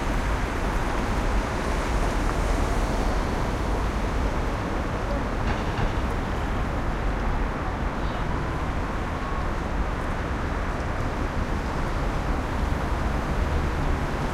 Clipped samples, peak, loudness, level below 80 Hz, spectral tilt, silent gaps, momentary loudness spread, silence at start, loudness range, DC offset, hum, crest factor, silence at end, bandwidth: under 0.1%; -12 dBFS; -28 LUFS; -28 dBFS; -6 dB/octave; none; 3 LU; 0 s; 2 LU; under 0.1%; none; 14 dB; 0 s; 13.5 kHz